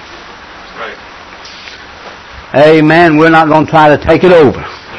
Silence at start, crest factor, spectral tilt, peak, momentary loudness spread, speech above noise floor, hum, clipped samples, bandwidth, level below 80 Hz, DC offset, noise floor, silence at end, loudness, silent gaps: 0.1 s; 10 dB; -7 dB/octave; 0 dBFS; 24 LU; 25 dB; none; 3%; 9.8 kHz; -36 dBFS; under 0.1%; -30 dBFS; 0 s; -6 LUFS; none